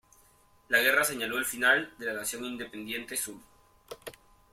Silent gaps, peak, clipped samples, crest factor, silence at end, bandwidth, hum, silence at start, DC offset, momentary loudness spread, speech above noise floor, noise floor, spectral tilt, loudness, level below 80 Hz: none; -10 dBFS; under 0.1%; 22 dB; 0.4 s; 16.5 kHz; none; 0.7 s; under 0.1%; 21 LU; 33 dB; -62 dBFS; -1 dB/octave; -28 LUFS; -66 dBFS